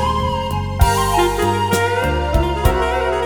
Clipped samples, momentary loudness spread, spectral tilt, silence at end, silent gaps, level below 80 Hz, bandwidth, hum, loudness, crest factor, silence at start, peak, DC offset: under 0.1%; 4 LU; -5 dB/octave; 0 s; none; -24 dBFS; over 20 kHz; none; -17 LUFS; 16 dB; 0 s; 0 dBFS; 0.3%